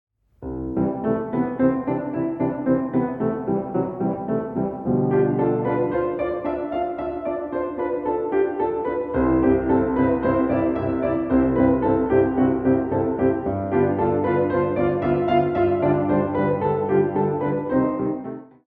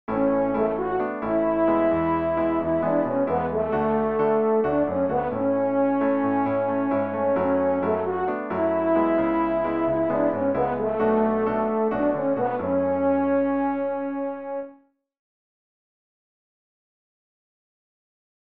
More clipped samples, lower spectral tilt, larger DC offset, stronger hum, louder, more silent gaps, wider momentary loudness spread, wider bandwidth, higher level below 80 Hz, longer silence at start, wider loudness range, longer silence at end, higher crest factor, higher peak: neither; about the same, -11.5 dB/octave vs -11 dB/octave; second, under 0.1% vs 0.3%; neither; about the same, -22 LUFS vs -23 LUFS; neither; first, 7 LU vs 4 LU; about the same, 4.3 kHz vs 4.5 kHz; first, -44 dBFS vs -52 dBFS; first, 0.4 s vs 0.1 s; about the same, 4 LU vs 5 LU; second, 0.2 s vs 3.85 s; about the same, 16 dB vs 14 dB; first, -6 dBFS vs -10 dBFS